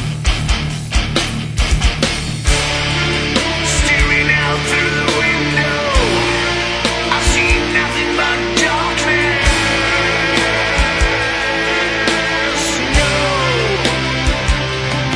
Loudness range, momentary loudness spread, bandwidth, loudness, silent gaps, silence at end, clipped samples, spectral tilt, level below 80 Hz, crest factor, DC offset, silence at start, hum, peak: 2 LU; 4 LU; 11 kHz; -14 LUFS; none; 0 s; under 0.1%; -3.5 dB/octave; -22 dBFS; 16 dB; under 0.1%; 0 s; none; 0 dBFS